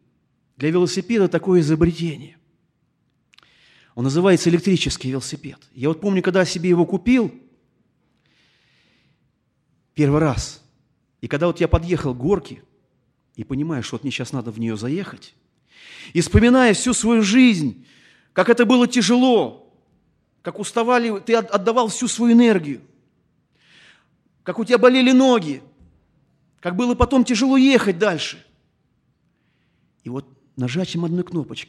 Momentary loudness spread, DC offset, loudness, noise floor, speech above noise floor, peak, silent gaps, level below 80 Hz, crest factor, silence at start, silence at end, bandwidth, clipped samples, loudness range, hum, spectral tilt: 18 LU; under 0.1%; -18 LUFS; -67 dBFS; 49 dB; 0 dBFS; none; -40 dBFS; 20 dB; 0.6 s; 0.05 s; 12 kHz; under 0.1%; 9 LU; none; -5.5 dB/octave